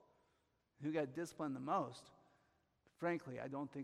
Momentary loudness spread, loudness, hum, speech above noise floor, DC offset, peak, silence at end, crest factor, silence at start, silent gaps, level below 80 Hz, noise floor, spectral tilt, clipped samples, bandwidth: 8 LU; -44 LUFS; none; 38 dB; under 0.1%; -26 dBFS; 0 s; 18 dB; 0.8 s; none; -84 dBFS; -81 dBFS; -6.5 dB/octave; under 0.1%; 13.5 kHz